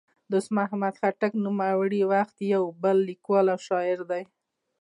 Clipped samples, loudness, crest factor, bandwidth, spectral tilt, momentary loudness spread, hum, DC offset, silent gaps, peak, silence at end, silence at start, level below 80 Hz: under 0.1%; -26 LUFS; 14 dB; 11 kHz; -7 dB/octave; 5 LU; none; under 0.1%; none; -12 dBFS; 0.6 s; 0.3 s; -80 dBFS